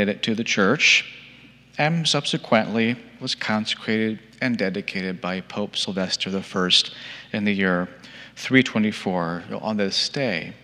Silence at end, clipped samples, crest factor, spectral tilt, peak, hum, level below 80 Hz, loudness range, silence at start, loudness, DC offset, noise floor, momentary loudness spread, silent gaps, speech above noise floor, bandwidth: 0.05 s; under 0.1%; 22 dB; -4 dB/octave; -2 dBFS; none; -66 dBFS; 4 LU; 0 s; -22 LUFS; under 0.1%; -48 dBFS; 11 LU; none; 25 dB; 11.5 kHz